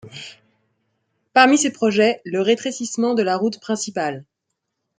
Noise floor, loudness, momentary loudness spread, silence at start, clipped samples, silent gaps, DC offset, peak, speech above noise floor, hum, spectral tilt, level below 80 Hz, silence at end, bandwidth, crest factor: -78 dBFS; -19 LUFS; 18 LU; 0.05 s; under 0.1%; none; under 0.1%; -2 dBFS; 59 dB; none; -3.5 dB/octave; -70 dBFS; 0.75 s; 9.6 kHz; 20 dB